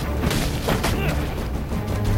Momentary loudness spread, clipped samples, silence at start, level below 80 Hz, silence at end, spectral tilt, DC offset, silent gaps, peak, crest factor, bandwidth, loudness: 5 LU; under 0.1%; 0 s; -28 dBFS; 0 s; -5.5 dB/octave; under 0.1%; none; -8 dBFS; 14 dB; 16.5 kHz; -24 LUFS